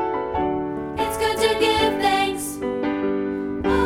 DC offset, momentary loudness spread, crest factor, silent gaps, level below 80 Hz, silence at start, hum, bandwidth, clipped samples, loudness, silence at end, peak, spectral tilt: under 0.1%; 8 LU; 16 dB; none; -42 dBFS; 0 s; none; 17 kHz; under 0.1%; -22 LUFS; 0 s; -6 dBFS; -4 dB/octave